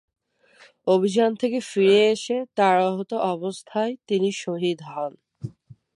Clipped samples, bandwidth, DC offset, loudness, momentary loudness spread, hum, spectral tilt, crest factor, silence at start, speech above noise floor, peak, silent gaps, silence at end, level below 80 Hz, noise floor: under 0.1%; 11.5 kHz; under 0.1%; -23 LUFS; 14 LU; none; -5 dB/octave; 16 dB; 0.85 s; 33 dB; -6 dBFS; none; 0.25 s; -70 dBFS; -55 dBFS